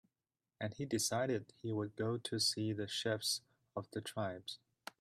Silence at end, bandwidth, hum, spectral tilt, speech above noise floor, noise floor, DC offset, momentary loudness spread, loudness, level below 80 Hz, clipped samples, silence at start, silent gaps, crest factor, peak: 0.45 s; 15.5 kHz; none; -3.5 dB/octave; over 51 dB; under -90 dBFS; under 0.1%; 13 LU; -39 LUFS; -78 dBFS; under 0.1%; 0.6 s; none; 16 dB; -24 dBFS